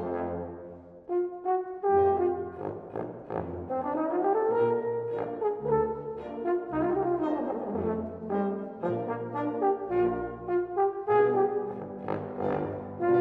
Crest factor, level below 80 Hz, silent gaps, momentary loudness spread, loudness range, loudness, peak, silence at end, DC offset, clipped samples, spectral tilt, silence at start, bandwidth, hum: 16 dB; -58 dBFS; none; 11 LU; 2 LU; -30 LUFS; -12 dBFS; 0 s; under 0.1%; under 0.1%; -10.5 dB/octave; 0 s; 4.4 kHz; none